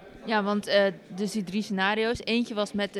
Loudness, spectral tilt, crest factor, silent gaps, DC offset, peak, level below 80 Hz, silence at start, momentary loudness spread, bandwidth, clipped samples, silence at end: -27 LUFS; -5 dB/octave; 16 dB; none; under 0.1%; -10 dBFS; -60 dBFS; 0 s; 7 LU; 13.5 kHz; under 0.1%; 0 s